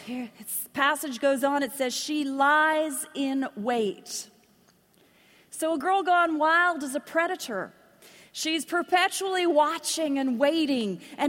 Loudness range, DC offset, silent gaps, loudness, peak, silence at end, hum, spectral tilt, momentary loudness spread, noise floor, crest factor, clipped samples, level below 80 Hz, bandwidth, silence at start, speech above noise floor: 3 LU; under 0.1%; none; -26 LUFS; -8 dBFS; 0 s; none; -2.5 dB/octave; 12 LU; -62 dBFS; 18 dB; under 0.1%; -76 dBFS; 16.5 kHz; 0 s; 36 dB